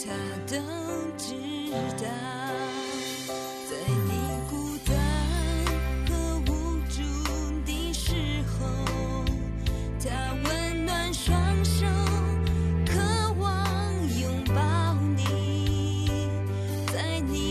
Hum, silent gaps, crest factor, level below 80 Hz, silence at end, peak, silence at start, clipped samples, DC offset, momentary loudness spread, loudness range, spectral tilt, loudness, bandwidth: none; none; 14 dB; -34 dBFS; 0 s; -14 dBFS; 0 s; under 0.1%; under 0.1%; 7 LU; 5 LU; -5.5 dB/octave; -28 LUFS; 14 kHz